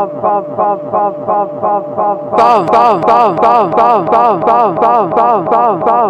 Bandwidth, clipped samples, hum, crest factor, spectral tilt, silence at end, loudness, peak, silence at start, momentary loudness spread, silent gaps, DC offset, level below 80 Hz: 8.6 kHz; 0.4%; none; 10 dB; -7 dB/octave; 0 s; -11 LUFS; 0 dBFS; 0 s; 6 LU; none; under 0.1%; -50 dBFS